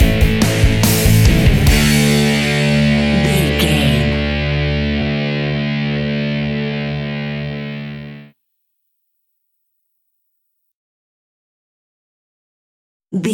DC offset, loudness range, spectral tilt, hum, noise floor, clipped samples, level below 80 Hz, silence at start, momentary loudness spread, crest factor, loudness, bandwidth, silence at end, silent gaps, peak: under 0.1%; 16 LU; -5 dB/octave; none; -69 dBFS; under 0.1%; -24 dBFS; 0 s; 12 LU; 16 dB; -15 LUFS; 17 kHz; 0 s; 10.74-13.00 s; 0 dBFS